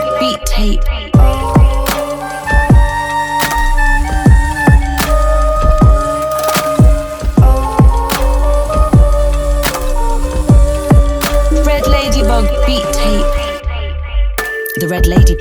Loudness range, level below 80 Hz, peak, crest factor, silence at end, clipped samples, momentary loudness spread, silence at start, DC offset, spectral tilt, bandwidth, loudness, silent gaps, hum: 2 LU; -12 dBFS; 0 dBFS; 10 dB; 0 s; under 0.1%; 7 LU; 0 s; under 0.1%; -5.5 dB/octave; over 20 kHz; -13 LUFS; none; none